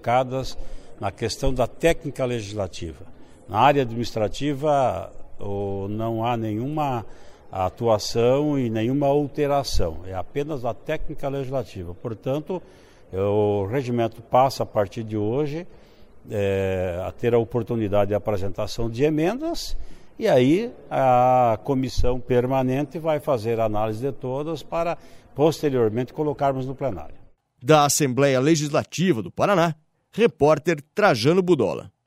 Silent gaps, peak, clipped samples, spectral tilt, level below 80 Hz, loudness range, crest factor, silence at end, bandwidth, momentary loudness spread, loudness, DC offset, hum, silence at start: none; -2 dBFS; under 0.1%; -5.5 dB/octave; -40 dBFS; 5 LU; 20 dB; 0.15 s; 16 kHz; 13 LU; -23 LUFS; under 0.1%; none; 0 s